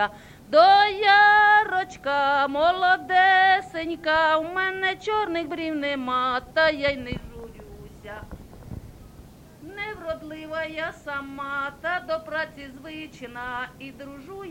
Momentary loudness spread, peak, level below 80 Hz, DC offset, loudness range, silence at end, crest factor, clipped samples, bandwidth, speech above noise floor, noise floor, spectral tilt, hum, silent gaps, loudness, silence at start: 24 LU; -4 dBFS; -52 dBFS; under 0.1%; 16 LU; 0 s; 20 dB; under 0.1%; 16.5 kHz; 24 dB; -47 dBFS; -4.5 dB/octave; none; none; -22 LUFS; 0 s